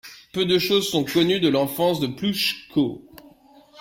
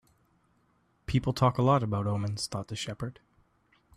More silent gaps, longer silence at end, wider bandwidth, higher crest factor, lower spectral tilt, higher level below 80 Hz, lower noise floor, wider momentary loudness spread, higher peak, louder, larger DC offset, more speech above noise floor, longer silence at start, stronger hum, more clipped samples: neither; second, 0 s vs 0.85 s; first, 16.5 kHz vs 13.5 kHz; about the same, 16 dB vs 20 dB; second, -4.5 dB/octave vs -6.5 dB/octave; about the same, -58 dBFS vs -54 dBFS; second, -51 dBFS vs -69 dBFS; second, 7 LU vs 13 LU; first, -6 dBFS vs -12 dBFS; first, -22 LUFS vs -30 LUFS; neither; second, 30 dB vs 41 dB; second, 0.05 s vs 1.1 s; neither; neither